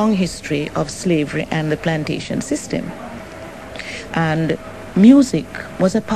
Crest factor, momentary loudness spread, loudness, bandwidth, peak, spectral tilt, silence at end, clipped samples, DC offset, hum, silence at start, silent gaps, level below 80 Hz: 18 dB; 19 LU; -18 LUFS; 13 kHz; 0 dBFS; -6 dB/octave; 0 s; under 0.1%; 0.4%; none; 0 s; none; -44 dBFS